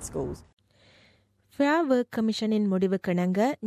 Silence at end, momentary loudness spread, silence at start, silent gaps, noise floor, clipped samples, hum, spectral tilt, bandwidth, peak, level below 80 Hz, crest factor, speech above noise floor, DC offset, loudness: 0 s; 10 LU; 0 s; 0.53-0.57 s; -63 dBFS; under 0.1%; none; -6 dB/octave; 14 kHz; -12 dBFS; -56 dBFS; 14 dB; 37 dB; under 0.1%; -26 LUFS